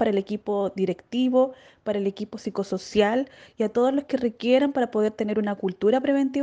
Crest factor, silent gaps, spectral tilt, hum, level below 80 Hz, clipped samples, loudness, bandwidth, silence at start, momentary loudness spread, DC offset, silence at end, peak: 18 dB; none; -6.5 dB/octave; none; -62 dBFS; under 0.1%; -25 LUFS; 9 kHz; 0 s; 8 LU; under 0.1%; 0 s; -6 dBFS